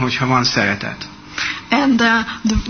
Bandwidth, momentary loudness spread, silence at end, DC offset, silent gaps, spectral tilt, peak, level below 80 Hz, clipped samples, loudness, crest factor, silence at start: 6.6 kHz; 13 LU; 0 s; 0.1%; none; -4.5 dB/octave; -2 dBFS; -34 dBFS; under 0.1%; -16 LUFS; 16 dB; 0 s